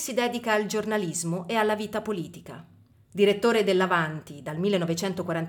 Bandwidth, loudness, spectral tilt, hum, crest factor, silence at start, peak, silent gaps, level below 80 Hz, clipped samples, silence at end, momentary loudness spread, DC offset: 19 kHz; -26 LUFS; -4.5 dB/octave; none; 16 dB; 0 s; -10 dBFS; none; -66 dBFS; under 0.1%; 0 s; 15 LU; under 0.1%